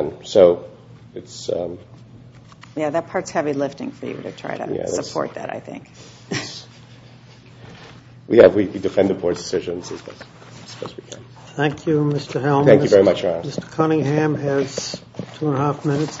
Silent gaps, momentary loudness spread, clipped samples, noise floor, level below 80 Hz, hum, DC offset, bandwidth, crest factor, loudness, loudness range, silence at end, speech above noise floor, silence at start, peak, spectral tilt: none; 24 LU; under 0.1%; -44 dBFS; -56 dBFS; none; under 0.1%; 8 kHz; 20 dB; -19 LUFS; 11 LU; 0 s; 25 dB; 0 s; 0 dBFS; -6 dB/octave